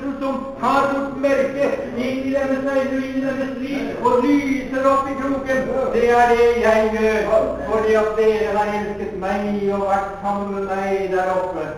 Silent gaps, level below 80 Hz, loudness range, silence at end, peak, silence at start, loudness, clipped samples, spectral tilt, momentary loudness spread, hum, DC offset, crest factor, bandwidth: none; -42 dBFS; 4 LU; 0 s; -4 dBFS; 0 s; -19 LUFS; under 0.1%; -6 dB/octave; 8 LU; none; under 0.1%; 16 dB; 18 kHz